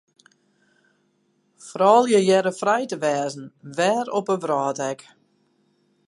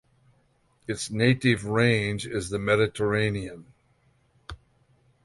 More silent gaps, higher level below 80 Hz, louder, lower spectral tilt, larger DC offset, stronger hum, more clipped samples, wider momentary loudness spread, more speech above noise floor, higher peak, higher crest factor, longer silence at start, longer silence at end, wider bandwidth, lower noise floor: neither; second, -78 dBFS vs -52 dBFS; first, -21 LUFS vs -25 LUFS; about the same, -4.5 dB/octave vs -5.5 dB/octave; neither; neither; neither; second, 16 LU vs 20 LU; first, 46 dB vs 41 dB; about the same, -4 dBFS vs -6 dBFS; about the same, 20 dB vs 20 dB; first, 1.65 s vs 0.9 s; first, 1.15 s vs 0.7 s; about the same, 11.5 kHz vs 11.5 kHz; about the same, -67 dBFS vs -66 dBFS